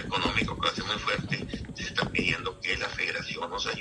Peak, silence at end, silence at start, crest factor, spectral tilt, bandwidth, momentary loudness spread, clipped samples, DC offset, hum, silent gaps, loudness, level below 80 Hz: -12 dBFS; 0 s; 0 s; 20 dB; -4 dB/octave; 11.5 kHz; 6 LU; under 0.1%; under 0.1%; none; none; -29 LUFS; -48 dBFS